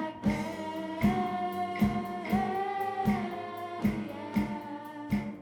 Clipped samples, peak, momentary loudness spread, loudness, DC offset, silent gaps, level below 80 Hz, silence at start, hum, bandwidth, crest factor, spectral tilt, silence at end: under 0.1%; -14 dBFS; 8 LU; -32 LUFS; under 0.1%; none; -52 dBFS; 0 s; none; 19 kHz; 18 dB; -7 dB/octave; 0 s